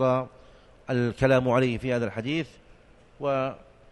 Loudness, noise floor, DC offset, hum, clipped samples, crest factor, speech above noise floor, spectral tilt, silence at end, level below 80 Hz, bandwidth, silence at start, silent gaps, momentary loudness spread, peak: -26 LUFS; -54 dBFS; under 0.1%; none; under 0.1%; 18 dB; 29 dB; -7 dB/octave; 0.35 s; -52 dBFS; 11.5 kHz; 0 s; none; 18 LU; -8 dBFS